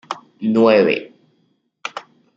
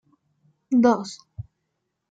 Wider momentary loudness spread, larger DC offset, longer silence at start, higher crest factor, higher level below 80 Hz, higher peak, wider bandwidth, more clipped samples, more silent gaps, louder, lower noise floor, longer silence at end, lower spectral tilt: second, 19 LU vs 23 LU; neither; second, 0.1 s vs 0.7 s; about the same, 18 dB vs 20 dB; second, -68 dBFS vs -60 dBFS; first, -2 dBFS vs -6 dBFS; second, 7.6 kHz vs 8.8 kHz; neither; neither; first, -16 LUFS vs -21 LUFS; second, -64 dBFS vs -78 dBFS; second, 0.35 s vs 0.7 s; about the same, -6 dB/octave vs -6 dB/octave